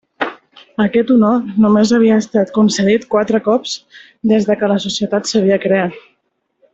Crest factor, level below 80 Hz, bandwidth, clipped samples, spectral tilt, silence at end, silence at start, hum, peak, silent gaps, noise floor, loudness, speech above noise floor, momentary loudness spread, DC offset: 12 dB; -54 dBFS; 8 kHz; under 0.1%; -5.5 dB/octave; 0.75 s; 0.2 s; none; -2 dBFS; none; -66 dBFS; -14 LUFS; 53 dB; 11 LU; under 0.1%